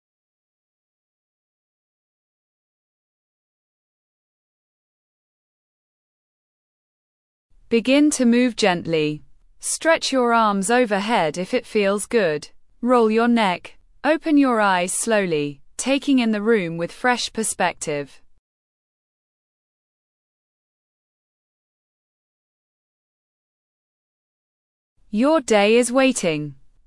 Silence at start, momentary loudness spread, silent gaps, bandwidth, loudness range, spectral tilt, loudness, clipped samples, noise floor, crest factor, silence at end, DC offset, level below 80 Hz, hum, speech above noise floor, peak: 7.7 s; 11 LU; 18.39-24.96 s; 12 kHz; 8 LU; -4 dB/octave; -20 LUFS; under 0.1%; under -90 dBFS; 18 dB; 0.35 s; under 0.1%; -60 dBFS; none; over 71 dB; -4 dBFS